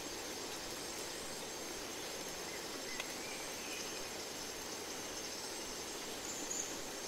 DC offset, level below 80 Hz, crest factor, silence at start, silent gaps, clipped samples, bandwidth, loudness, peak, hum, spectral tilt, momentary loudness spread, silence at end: under 0.1%; -66 dBFS; 20 dB; 0 s; none; under 0.1%; 16 kHz; -42 LUFS; -24 dBFS; none; -1 dB/octave; 3 LU; 0 s